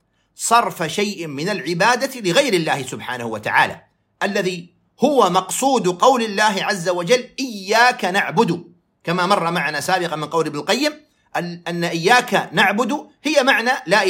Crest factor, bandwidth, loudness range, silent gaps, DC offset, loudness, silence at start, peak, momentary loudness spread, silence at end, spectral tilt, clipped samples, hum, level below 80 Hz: 18 dB; 16.5 kHz; 3 LU; none; under 0.1%; -18 LUFS; 0.4 s; -2 dBFS; 10 LU; 0 s; -3.5 dB/octave; under 0.1%; none; -68 dBFS